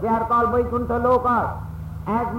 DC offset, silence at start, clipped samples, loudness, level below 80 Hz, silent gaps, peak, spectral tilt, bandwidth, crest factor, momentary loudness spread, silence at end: under 0.1%; 0 s; under 0.1%; -21 LUFS; -38 dBFS; none; -8 dBFS; -9 dB/octave; 16.5 kHz; 12 dB; 13 LU; 0 s